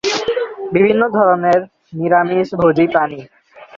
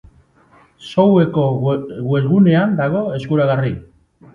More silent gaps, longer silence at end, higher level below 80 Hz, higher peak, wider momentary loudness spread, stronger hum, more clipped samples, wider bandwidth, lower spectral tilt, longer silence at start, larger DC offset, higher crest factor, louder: neither; second, 0 s vs 0.5 s; about the same, -52 dBFS vs -50 dBFS; about the same, 0 dBFS vs 0 dBFS; about the same, 9 LU vs 10 LU; neither; neither; about the same, 7.6 kHz vs 7 kHz; second, -5.5 dB/octave vs -9.5 dB/octave; second, 0.05 s vs 0.8 s; neither; about the same, 14 dB vs 16 dB; about the same, -15 LUFS vs -16 LUFS